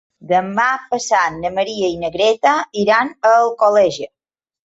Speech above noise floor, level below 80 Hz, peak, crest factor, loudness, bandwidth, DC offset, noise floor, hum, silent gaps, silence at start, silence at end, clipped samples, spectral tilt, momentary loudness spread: 73 dB; -56 dBFS; -2 dBFS; 14 dB; -16 LUFS; 8 kHz; under 0.1%; -89 dBFS; none; none; 0.25 s; 0.6 s; under 0.1%; -3.5 dB/octave; 7 LU